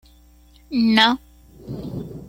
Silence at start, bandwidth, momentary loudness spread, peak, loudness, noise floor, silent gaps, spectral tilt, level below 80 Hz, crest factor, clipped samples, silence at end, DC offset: 0.7 s; 16 kHz; 18 LU; -2 dBFS; -18 LUFS; -51 dBFS; none; -5 dB/octave; -48 dBFS; 22 dB; under 0.1%; 0 s; under 0.1%